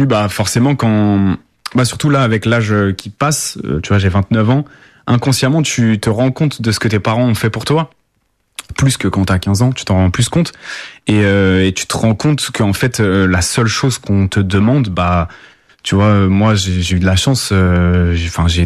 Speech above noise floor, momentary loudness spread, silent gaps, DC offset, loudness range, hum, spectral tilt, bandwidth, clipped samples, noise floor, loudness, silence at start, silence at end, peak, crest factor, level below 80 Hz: 50 dB; 6 LU; none; under 0.1%; 2 LU; none; -5.5 dB/octave; 14 kHz; under 0.1%; -63 dBFS; -14 LUFS; 0 s; 0 s; -2 dBFS; 12 dB; -34 dBFS